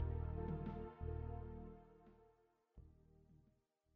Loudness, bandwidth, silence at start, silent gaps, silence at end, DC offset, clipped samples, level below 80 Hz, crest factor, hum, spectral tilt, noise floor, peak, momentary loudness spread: -49 LUFS; 3.8 kHz; 0 s; none; 0.6 s; under 0.1%; under 0.1%; -54 dBFS; 18 dB; none; -10 dB/octave; -79 dBFS; -30 dBFS; 21 LU